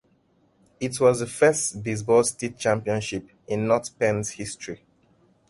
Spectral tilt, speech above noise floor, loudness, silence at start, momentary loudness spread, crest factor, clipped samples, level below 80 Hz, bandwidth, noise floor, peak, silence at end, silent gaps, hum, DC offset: -4.5 dB/octave; 40 dB; -24 LUFS; 0.8 s; 13 LU; 18 dB; under 0.1%; -58 dBFS; 11.5 kHz; -64 dBFS; -6 dBFS; 0.75 s; none; none; under 0.1%